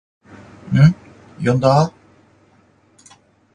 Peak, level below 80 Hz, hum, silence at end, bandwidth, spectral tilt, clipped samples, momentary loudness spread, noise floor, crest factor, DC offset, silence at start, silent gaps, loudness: 0 dBFS; -48 dBFS; none; 1.65 s; 9.8 kHz; -8 dB/octave; under 0.1%; 10 LU; -55 dBFS; 18 dB; under 0.1%; 0.65 s; none; -16 LUFS